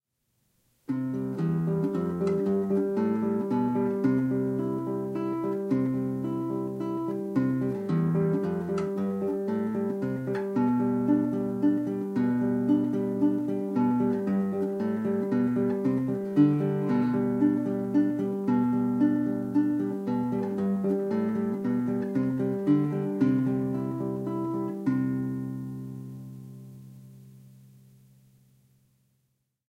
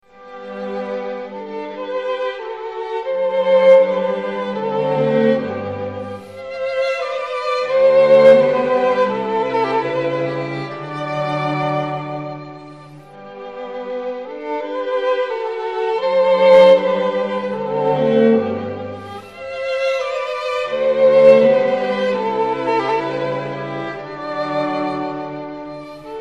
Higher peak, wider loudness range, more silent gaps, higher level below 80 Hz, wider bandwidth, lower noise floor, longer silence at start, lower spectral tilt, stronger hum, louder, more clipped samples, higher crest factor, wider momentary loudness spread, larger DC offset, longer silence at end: second, -10 dBFS vs 0 dBFS; second, 5 LU vs 10 LU; neither; about the same, -66 dBFS vs -62 dBFS; first, 9.2 kHz vs 7.6 kHz; first, -76 dBFS vs -39 dBFS; first, 0.9 s vs 0.2 s; first, -10 dB/octave vs -6.5 dB/octave; neither; second, -28 LUFS vs -17 LUFS; neither; about the same, 16 dB vs 18 dB; second, 6 LU vs 19 LU; second, under 0.1% vs 0.2%; first, 2.2 s vs 0 s